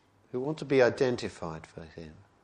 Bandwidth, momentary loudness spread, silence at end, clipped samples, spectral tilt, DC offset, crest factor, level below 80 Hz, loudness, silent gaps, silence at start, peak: 10 kHz; 21 LU; 0.3 s; under 0.1%; -6 dB/octave; under 0.1%; 20 dB; -62 dBFS; -29 LUFS; none; 0.35 s; -10 dBFS